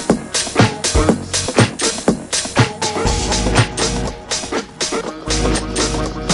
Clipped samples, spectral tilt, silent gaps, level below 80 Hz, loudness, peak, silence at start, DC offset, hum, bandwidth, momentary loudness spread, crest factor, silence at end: under 0.1%; -4 dB/octave; none; -28 dBFS; -17 LUFS; 0 dBFS; 0 s; under 0.1%; none; 11.5 kHz; 6 LU; 18 dB; 0 s